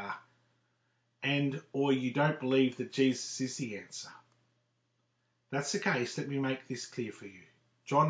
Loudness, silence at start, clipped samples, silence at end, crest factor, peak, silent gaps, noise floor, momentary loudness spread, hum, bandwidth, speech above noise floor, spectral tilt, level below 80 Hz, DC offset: -33 LUFS; 0 s; under 0.1%; 0 s; 20 dB; -14 dBFS; none; -78 dBFS; 15 LU; none; 8 kHz; 45 dB; -5 dB/octave; -82 dBFS; under 0.1%